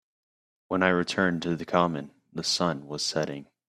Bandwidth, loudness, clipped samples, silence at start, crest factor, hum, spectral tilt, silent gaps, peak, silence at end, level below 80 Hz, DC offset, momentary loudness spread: 14 kHz; -27 LUFS; under 0.1%; 0.7 s; 24 dB; none; -4 dB/octave; none; -4 dBFS; 0.25 s; -66 dBFS; under 0.1%; 8 LU